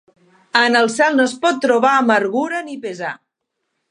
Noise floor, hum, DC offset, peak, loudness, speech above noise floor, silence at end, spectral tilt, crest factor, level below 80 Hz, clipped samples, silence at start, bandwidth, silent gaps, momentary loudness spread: -75 dBFS; none; under 0.1%; 0 dBFS; -16 LUFS; 59 dB; 0.75 s; -3 dB/octave; 18 dB; -74 dBFS; under 0.1%; 0.55 s; 11 kHz; none; 14 LU